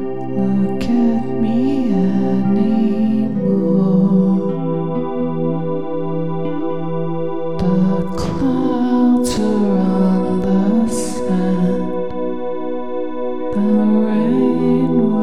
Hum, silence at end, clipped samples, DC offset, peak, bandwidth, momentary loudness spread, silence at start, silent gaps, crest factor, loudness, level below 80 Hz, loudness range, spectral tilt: none; 0 s; under 0.1%; 5%; -4 dBFS; 12 kHz; 8 LU; 0 s; none; 12 dB; -17 LUFS; -44 dBFS; 4 LU; -8 dB/octave